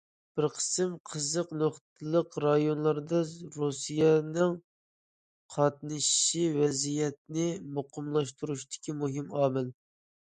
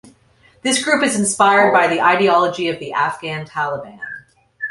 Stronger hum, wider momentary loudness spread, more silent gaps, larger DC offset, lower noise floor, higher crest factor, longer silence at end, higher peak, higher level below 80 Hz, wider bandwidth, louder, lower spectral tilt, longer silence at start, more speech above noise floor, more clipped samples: neither; second, 12 LU vs 17 LU; first, 1.00-1.05 s, 1.81-1.96 s, 4.64-5.49 s, 7.18-7.25 s vs none; neither; first, under -90 dBFS vs -53 dBFS; about the same, 20 dB vs 16 dB; first, 0.55 s vs 0 s; second, -12 dBFS vs -2 dBFS; second, -74 dBFS vs -60 dBFS; second, 9.6 kHz vs 11.5 kHz; second, -30 LUFS vs -16 LUFS; first, -4.5 dB/octave vs -3 dB/octave; second, 0.35 s vs 0.65 s; first, over 60 dB vs 37 dB; neither